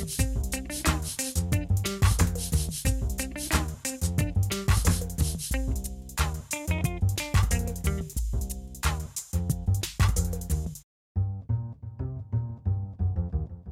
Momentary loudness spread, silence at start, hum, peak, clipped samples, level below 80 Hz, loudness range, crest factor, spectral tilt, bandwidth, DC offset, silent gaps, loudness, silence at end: 7 LU; 0 s; none; -10 dBFS; under 0.1%; -32 dBFS; 3 LU; 18 dB; -4.5 dB/octave; 16.5 kHz; under 0.1%; 10.84-11.15 s; -29 LUFS; 0 s